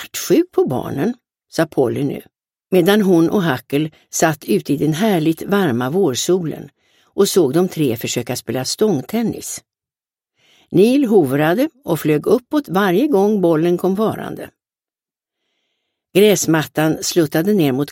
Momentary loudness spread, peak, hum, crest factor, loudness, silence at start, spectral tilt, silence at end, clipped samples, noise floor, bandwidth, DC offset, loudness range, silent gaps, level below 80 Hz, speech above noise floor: 9 LU; 0 dBFS; none; 16 dB; -17 LUFS; 0 s; -5 dB/octave; 0 s; under 0.1%; under -90 dBFS; 17 kHz; under 0.1%; 3 LU; none; -58 dBFS; over 74 dB